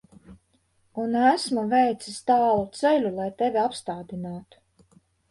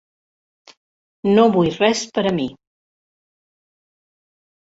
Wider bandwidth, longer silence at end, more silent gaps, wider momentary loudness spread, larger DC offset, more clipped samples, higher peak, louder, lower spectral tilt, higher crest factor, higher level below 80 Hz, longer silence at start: first, 11.5 kHz vs 8 kHz; second, 0.9 s vs 2.15 s; neither; first, 14 LU vs 11 LU; neither; neither; second, -6 dBFS vs -2 dBFS; second, -24 LUFS vs -18 LUFS; about the same, -5 dB/octave vs -5.5 dB/octave; about the same, 18 dB vs 20 dB; about the same, -62 dBFS vs -58 dBFS; second, 0.3 s vs 1.25 s